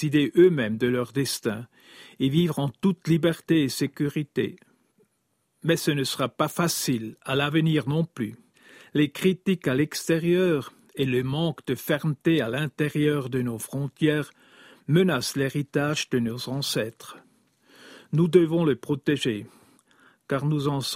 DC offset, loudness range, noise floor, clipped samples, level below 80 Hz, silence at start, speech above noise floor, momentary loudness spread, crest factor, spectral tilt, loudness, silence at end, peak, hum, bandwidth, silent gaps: under 0.1%; 2 LU; -73 dBFS; under 0.1%; -62 dBFS; 0 s; 49 dB; 9 LU; 20 dB; -5.5 dB/octave; -25 LUFS; 0 s; -6 dBFS; none; 16 kHz; none